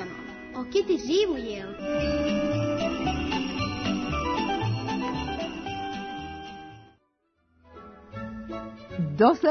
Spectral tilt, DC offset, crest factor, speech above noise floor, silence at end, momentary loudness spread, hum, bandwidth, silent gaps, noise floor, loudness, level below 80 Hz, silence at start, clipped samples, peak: -6 dB/octave; under 0.1%; 20 dB; 47 dB; 0 s; 15 LU; none; 6.6 kHz; none; -71 dBFS; -28 LUFS; -46 dBFS; 0 s; under 0.1%; -8 dBFS